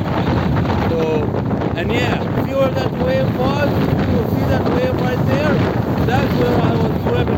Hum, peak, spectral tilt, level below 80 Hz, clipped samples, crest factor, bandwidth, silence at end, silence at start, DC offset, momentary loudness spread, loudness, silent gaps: none; -4 dBFS; -8 dB/octave; -34 dBFS; under 0.1%; 12 dB; 17 kHz; 0 s; 0 s; under 0.1%; 3 LU; -17 LUFS; none